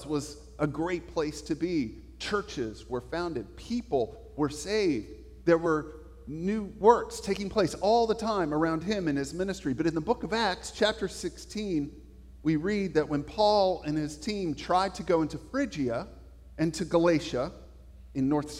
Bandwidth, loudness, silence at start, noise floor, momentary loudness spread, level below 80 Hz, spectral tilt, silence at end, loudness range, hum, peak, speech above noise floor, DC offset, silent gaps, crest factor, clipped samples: 14.5 kHz; -29 LUFS; 0 s; -49 dBFS; 11 LU; -50 dBFS; -5.5 dB/octave; 0 s; 5 LU; none; -6 dBFS; 21 dB; under 0.1%; none; 22 dB; under 0.1%